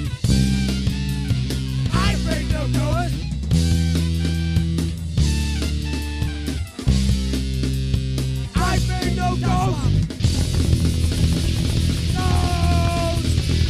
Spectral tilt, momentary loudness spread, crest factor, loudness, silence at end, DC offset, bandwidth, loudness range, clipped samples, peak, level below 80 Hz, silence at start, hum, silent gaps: -5.5 dB/octave; 5 LU; 14 dB; -21 LUFS; 0 s; under 0.1%; 14.5 kHz; 3 LU; under 0.1%; -6 dBFS; -24 dBFS; 0 s; none; none